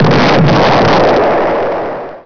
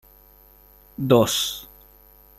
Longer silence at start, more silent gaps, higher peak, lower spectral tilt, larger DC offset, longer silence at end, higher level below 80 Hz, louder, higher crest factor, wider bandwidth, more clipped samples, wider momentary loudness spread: second, 0 s vs 1 s; neither; about the same, -2 dBFS vs -4 dBFS; first, -6.5 dB/octave vs -4.5 dB/octave; neither; second, 0 s vs 0.75 s; first, -34 dBFS vs -54 dBFS; first, -9 LUFS vs -21 LUFS; second, 6 dB vs 22 dB; second, 5.4 kHz vs 16 kHz; neither; second, 8 LU vs 19 LU